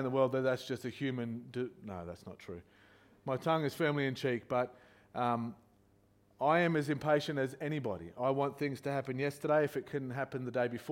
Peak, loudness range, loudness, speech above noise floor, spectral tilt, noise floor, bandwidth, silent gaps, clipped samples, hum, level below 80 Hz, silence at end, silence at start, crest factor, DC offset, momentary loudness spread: -16 dBFS; 4 LU; -35 LUFS; 34 dB; -6.5 dB/octave; -68 dBFS; 16.5 kHz; none; under 0.1%; none; -72 dBFS; 0 s; 0 s; 18 dB; under 0.1%; 14 LU